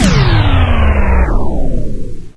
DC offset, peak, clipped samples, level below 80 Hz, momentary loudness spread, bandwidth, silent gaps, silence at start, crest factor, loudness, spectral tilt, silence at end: under 0.1%; 0 dBFS; under 0.1%; -14 dBFS; 12 LU; 11 kHz; none; 0 s; 10 dB; -13 LUFS; -6 dB/octave; 0.05 s